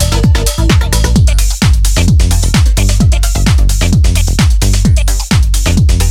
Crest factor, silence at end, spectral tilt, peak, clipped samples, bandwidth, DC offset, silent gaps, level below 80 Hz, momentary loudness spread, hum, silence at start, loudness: 8 dB; 0 s; -4.5 dB/octave; 0 dBFS; under 0.1%; 16 kHz; under 0.1%; none; -10 dBFS; 2 LU; none; 0 s; -10 LUFS